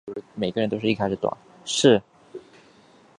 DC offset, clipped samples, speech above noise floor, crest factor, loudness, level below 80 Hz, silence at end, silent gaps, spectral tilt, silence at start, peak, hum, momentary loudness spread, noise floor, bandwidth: under 0.1%; under 0.1%; 31 dB; 22 dB; -23 LUFS; -60 dBFS; 0.8 s; none; -4.5 dB/octave; 0.05 s; -2 dBFS; none; 25 LU; -54 dBFS; 11 kHz